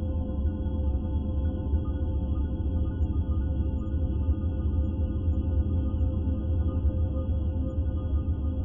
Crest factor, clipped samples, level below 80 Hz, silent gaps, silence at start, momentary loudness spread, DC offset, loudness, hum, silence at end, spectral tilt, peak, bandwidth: 10 dB; under 0.1%; -30 dBFS; none; 0 s; 2 LU; under 0.1%; -29 LUFS; none; 0 s; -12 dB/octave; -16 dBFS; 3.5 kHz